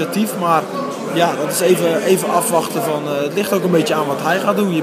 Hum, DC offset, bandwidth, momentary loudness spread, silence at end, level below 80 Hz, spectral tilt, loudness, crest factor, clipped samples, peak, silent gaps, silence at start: none; under 0.1%; 15.5 kHz; 5 LU; 0 s; -72 dBFS; -4.5 dB/octave; -17 LUFS; 16 dB; under 0.1%; 0 dBFS; none; 0 s